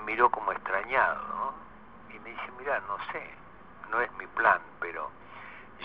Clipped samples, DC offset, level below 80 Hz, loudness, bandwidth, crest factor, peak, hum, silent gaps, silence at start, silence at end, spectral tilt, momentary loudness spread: under 0.1%; 0.2%; -62 dBFS; -30 LUFS; 5.6 kHz; 24 dB; -8 dBFS; none; none; 0 s; 0 s; -1.5 dB/octave; 21 LU